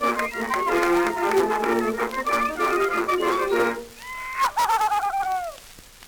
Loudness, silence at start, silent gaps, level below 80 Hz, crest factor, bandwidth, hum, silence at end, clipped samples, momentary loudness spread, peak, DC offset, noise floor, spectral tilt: -23 LUFS; 0 s; none; -50 dBFS; 14 dB; over 20 kHz; none; 0 s; under 0.1%; 9 LU; -8 dBFS; under 0.1%; -46 dBFS; -3.5 dB/octave